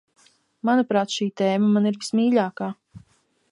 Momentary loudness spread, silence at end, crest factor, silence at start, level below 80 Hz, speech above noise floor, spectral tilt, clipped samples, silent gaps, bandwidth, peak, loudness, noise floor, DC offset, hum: 11 LU; 0.55 s; 16 dB; 0.65 s; -70 dBFS; 42 dB; -5.5 dB/octave; under 0.1%; none; 11 kHz; -6 dBFS; -22 LUFS; -63 dBFS; under 0.1%; none